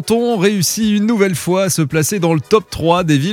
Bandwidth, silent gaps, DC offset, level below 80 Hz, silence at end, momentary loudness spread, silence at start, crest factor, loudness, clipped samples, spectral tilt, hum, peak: 17.5 kHz; none; under 0.1%; -44 dBFS; 0 s; 2 LU; 0 s; 14 dB; -15 LUFS; under 0.1%; -5 dB/octave; none; 0 dBFS